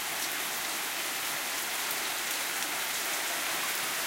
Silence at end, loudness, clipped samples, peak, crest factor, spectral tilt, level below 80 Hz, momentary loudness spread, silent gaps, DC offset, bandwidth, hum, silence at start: 0 s; -30 LUFS; under 0.1%; -12 dBFS; 20 dB; 1 dB/octave; -72 dBFS; 1 LU; none; under 0.1%; 16.5 kHz; none; 0 s